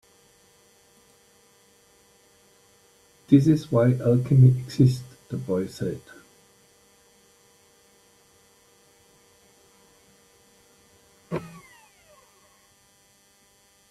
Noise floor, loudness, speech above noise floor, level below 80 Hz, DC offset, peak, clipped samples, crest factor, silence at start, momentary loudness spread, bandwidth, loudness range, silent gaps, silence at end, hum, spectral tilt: -60 dBFS; -22 LUFS; 40 dB; -60 dBFS; under 0.1%; -4 dBFS; under 0.1%; 24 dB; 3.3 s; 17 LU; 12.5 kHz; 21 LU; none; 2.45 s; none; -8.5 dB/octave